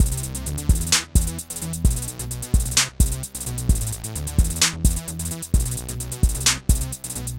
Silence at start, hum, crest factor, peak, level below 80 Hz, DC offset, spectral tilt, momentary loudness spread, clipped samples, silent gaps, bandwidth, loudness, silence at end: 0 s; none; 18 dB; -4 dBFS; -24 dBFS; under 0.1%; -3 dB/octave; 10 LU; under 0.1%; none; 17 kHz; -23 LUFS; 0 s